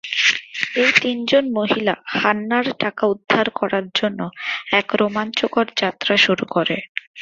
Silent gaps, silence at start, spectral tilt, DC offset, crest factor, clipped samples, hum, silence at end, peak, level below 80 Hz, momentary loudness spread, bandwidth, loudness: 6.89-6.95 s, 7.07-7.14 s; 0.05 s; -4 dB/octave; under 0.1%; 20 dB; under 0.1%; none; 0 s; 0 dBFS; -62 dBFS; 8 LU; 7.8 kHz; -19 LUFS